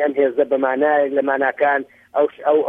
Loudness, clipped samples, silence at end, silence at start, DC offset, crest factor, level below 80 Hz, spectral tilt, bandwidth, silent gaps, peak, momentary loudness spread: -18 LUFS; under 0.1%; 0 s; 0 s; under 0.1%; 14 dB; -70 dBFS; -7 dB/octave; 3.7 kHz; none; -4 dBFS; 4 LU